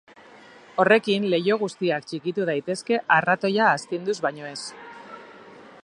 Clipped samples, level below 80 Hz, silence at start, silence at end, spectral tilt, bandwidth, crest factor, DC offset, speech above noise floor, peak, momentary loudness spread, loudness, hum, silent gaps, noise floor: under 0.1%; -74 dBFS; 0.75 s; 0.2 s; -5 dB/octave; 11 kHz; 22 dB; under 0.1%; 26 dB; -2 dBFS; 19 LU; -23 LUFS; none; none; -48 dBFS